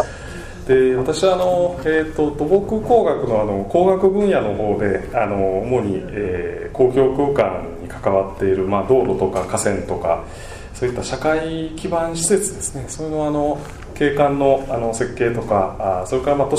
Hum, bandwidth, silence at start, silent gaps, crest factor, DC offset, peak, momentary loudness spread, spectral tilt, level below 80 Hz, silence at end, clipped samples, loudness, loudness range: none; 14 kHz; 0 s; none; 16 dB; under 0.1%; -2 dBFS; 10 LU; -5.5 dB/octave; -38 dBFS; 0 s; under 0.1%; -19 LUFS; 4 LU